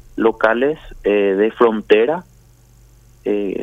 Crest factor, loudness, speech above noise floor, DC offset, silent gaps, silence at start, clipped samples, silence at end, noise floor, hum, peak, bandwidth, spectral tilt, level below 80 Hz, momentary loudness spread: 18 dB; -17 LUFS; 32 dB; under 0.1%; none; 0.15 s; under 0.1%; 0 s; -48 dBFS; none; 0 dBFS; 7.4 kHz; -7 dB/octave; -46 dBFS; 8 LU